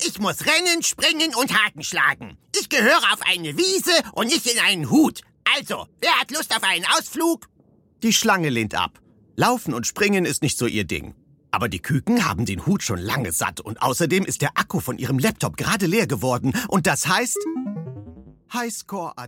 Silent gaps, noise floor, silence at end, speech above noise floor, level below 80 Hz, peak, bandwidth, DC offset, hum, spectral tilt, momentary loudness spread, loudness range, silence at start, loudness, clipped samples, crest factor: none; -57 dBFS; 0 s; 36 dB; -52 dBFS; -2 dBFS; 17 kHz; under 0.1%; none; -3 dB/octave; 10 LU; 4 LU; 0 s; -21 LUFS; under 0.1%; 20 dB